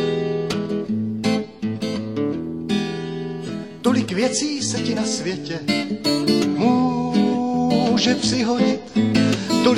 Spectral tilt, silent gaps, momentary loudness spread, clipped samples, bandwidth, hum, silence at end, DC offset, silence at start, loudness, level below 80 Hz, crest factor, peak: -5 dB/octave; none; 8 LU; under 0.1%; 14 kHz; none; 0 s; 0.2%; 0 s; -21 LUFS; -54 dBFS; 16 dB; -6 dBFS